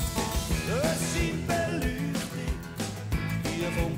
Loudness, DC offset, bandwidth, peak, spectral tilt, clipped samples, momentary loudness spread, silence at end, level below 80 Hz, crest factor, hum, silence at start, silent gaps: -30 LUFS; under 0.1%; 16.5 kHz; -14 dBFS; -5 dB/octave; under 0.1%; 7 LU; 0 s; -38 dBFS; 14 dB; none; 0 s; none